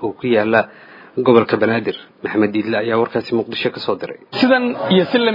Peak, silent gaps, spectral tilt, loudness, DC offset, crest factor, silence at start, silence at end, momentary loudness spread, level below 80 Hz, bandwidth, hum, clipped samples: 0 dBFS; none; -8 dB/octave; -17 LUFS; under 0.1%; 16 dB; 0 s; 0 s; 12 LU; -64 dBFS; 5.4 kHz; none; under 0.1%